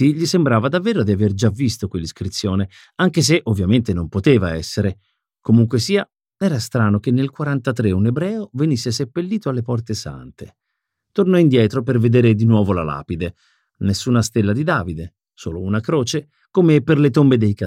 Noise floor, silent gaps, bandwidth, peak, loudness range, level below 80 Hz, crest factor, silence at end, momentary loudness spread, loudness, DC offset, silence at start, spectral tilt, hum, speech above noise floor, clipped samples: -77 dBFS; none; 15 kHz; -2 dBFS; 4 LU; -46 dBFS; 16 dB; 0 s; 12 LU; -18 LUFS; under 0.1%; 0 s; -6.5 dB/octave; none; 60 dB; under 0.1%